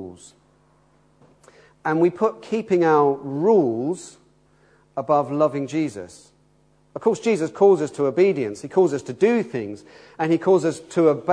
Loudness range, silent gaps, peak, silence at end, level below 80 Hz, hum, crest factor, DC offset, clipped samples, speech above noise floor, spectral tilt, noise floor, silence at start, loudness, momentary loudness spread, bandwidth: 4 LU; none; -4 dBFS; 0 s; -68 dBFS; none; 16 dB; under 0.1%; under 0.1%; 39 dB; -7 dB/octave; -59 dBFS; 0 s; -21 LUFS; 14 LU; 10.5 kHz